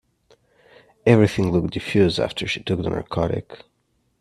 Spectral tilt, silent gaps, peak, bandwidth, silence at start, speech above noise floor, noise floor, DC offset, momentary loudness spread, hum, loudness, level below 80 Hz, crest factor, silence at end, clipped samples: -6.5 dB/octave; none; 0 dBFS; 13 kHz; 1.05 s; 48 dB; -68 dBFS; under 0.1%; 9 LU; none; -21 LUFS; -48 dBFS; 22 dB; 0.65 s; under 0.1%